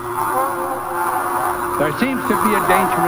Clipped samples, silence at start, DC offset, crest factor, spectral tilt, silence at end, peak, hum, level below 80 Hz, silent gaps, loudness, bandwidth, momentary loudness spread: under 0.1%; 0 s; under 0.1%; 18 dB; -4.5 dB/octave; 0 s; -2 dBFS; none; -48 dBFS; none; -18 LUFS; over 20 kHz; 6 LU